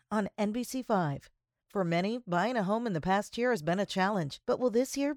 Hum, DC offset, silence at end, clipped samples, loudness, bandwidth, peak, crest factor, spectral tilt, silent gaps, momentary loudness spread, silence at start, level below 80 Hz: none; under 0.1%; 0 s; under 0.1%; -31 LUFS; 17.5 kHz; -14 dBFS; 16 dB; -5.5 dB/octave; none; 5 LU; 0.1 s; -64 dBFS